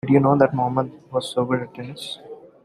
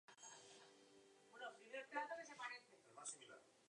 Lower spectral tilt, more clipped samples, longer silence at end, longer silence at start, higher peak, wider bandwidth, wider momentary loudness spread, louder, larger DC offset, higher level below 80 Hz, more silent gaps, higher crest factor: first, -7 dB/octave vs -0.5 dB/octave; neither; first, 0.2 s vs 0 s; about the same, 0.05 s vs 0.1 s; first, -2 dBFS vs -34 dBFS; first, 13 kHz vs 10.5 kHz; about the same, 17 LU vs 18 LU; first, -21 LUFS vs -54 LUFS; neither; first, -60 dBFS vs under -90 dBFS; neither; about the same, 20 dB vs 24 dB